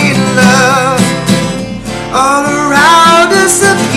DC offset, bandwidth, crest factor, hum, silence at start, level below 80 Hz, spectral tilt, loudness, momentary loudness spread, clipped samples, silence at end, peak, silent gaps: under 0.1%; 15.5 kHz; 8 dB; none; 0 s; -36 dBFS; -3.5 dB/octave; -7 LUFS; 11 LU; 0.7%; 0 s; 0 dBFS; none